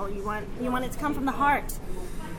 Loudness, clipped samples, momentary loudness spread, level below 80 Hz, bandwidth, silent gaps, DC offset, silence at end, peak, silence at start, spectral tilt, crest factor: -29 LUFS; under 0.1%; 13 LU; -36 dBFS; 17.5 kHz; none; under 0.1%; 0 s; -10 dBFS; 0 s; -5 dB/octave; 18 dB